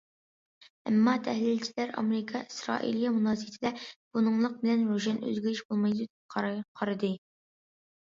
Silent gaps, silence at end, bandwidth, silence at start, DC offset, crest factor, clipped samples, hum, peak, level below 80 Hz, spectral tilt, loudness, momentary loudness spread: 3.96-4.11 s, 5.65-5.69 s, 6.10-6.29 s, 6.68-6.75 s; 0.95 s; 7.6 kHz; 0.85 s; under 0.1%; 18 dB; under 0.1%; none; -12 dBFS; -74 dBFS; -6 dB/octave; -30 LUFS; 8 LU